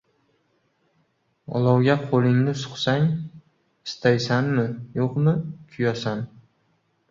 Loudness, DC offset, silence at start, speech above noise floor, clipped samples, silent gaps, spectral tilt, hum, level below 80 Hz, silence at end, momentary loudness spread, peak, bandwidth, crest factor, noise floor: -23 LUFS; under 0.1%; 1.5 s; 46 dB; under 0.1%; none; -7 dB/octave; none; -60 dBFS; 0.85 s; 13 LU; -4 dBFS; 7.6 kHz; 20 dB; -68 dBFS